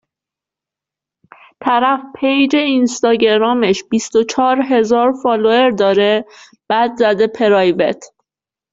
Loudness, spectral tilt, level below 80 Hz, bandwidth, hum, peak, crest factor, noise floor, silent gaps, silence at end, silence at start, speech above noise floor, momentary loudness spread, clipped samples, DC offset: -14 LUFS; -4.5 dB/octave; -58 dBFS; 7.8 kHz; none; 0 dBFS; 14 dB; -87 dBFS; none; 0.65 s; 1.6 s; 74 dB; 5 LU; under 0.1%; under 0.1%